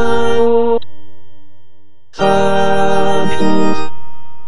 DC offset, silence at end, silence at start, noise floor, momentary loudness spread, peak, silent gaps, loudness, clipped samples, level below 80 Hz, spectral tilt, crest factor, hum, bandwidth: 30%; 0 s; 0 s; -40 dBFS; 8 LU; 0 dBFS; none; -14 LUFS; under 0.1%; -42 dBFS; -6 dB/octave; 14 dB; none; 10 kHz